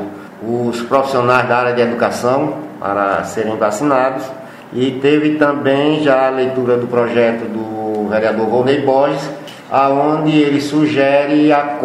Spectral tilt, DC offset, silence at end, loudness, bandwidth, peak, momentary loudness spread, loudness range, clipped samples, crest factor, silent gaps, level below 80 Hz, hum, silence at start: -6 dB/octave; under 0.1%; 0 s; -15 LUFS; 13.5 kHz; 0 dBFS; 9 LU; 2 LU; under 0.1%; 14 dB; none; -58 dBFS; none; 0 s